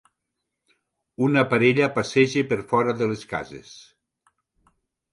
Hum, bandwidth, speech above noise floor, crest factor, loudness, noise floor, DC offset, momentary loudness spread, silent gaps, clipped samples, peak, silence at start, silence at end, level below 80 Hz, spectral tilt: none; 11.5 kHz; 59 dB; 20 dB; -22 LUFS; -81 dBFS; under 0.1%; 13 LU; none; under 0.1%; -4 dBFS; 1.2 s; 1.3 s; -62 dBFS; -6 dB/octave